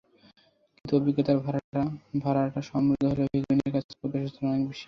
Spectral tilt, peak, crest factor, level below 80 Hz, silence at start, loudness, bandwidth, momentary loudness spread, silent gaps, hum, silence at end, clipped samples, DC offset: -9 dB/octave; -10 dBFS; 16 dB; -58 dBFS; 0.85 s; -28 LUFS; 6.6 kHz; 7 LU; 1.64-1.73 s, 3.84-3.89 s; none; 0 s; under 0.1%; under 0.1%